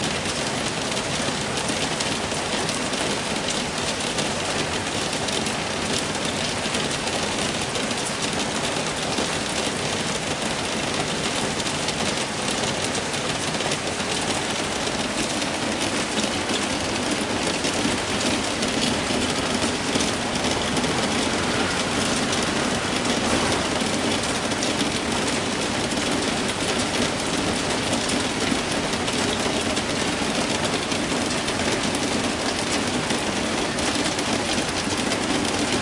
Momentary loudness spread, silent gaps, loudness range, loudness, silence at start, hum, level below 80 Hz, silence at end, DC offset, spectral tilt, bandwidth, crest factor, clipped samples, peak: 2 LU; none; 2 LU; -23 LUFS; 0 s; none; -46 dBFS; 0 s; under 0.1%; -3 dB/octave; 11.5 kHz; 18 dB; under 0.1%; -6 dBFS